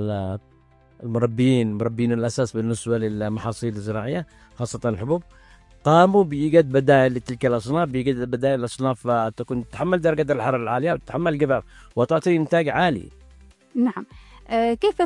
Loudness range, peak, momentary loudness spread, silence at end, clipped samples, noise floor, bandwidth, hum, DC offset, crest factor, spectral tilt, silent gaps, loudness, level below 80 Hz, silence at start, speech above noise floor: 6 LU; -2 dBFS; 11 LU; 0 s; under 0.1%; -50 dBFS; 11.5 kHz; none; under 0.1%; 20 dB; -7 dB/octave; none; -22 LUFS; -50 dBFS; 0 s; 29 dB